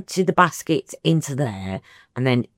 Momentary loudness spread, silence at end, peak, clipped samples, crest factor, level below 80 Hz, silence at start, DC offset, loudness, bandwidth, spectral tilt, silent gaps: 14 LU; 0.1 s; -2 dBFS; under 0.1%; 20 dB; -64 dBFS; 0 s; under 0.1%; -22 LUFS; 16.5 kHz; -5.5 dB/octave; none